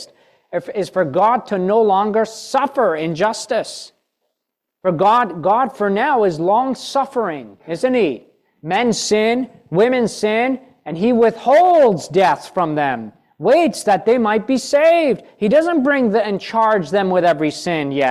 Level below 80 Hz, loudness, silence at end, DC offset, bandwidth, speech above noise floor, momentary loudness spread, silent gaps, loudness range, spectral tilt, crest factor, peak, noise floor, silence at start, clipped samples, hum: -60 dBFS; -17 LUFS; 0 s; under 0.1%; 13.5 kHz; 63 dB; 9 LU; none; 4 LU; -5 dB/octave; 12 dB; -4 dBFS; -79 dBFS; 0 s; under 0.1%; none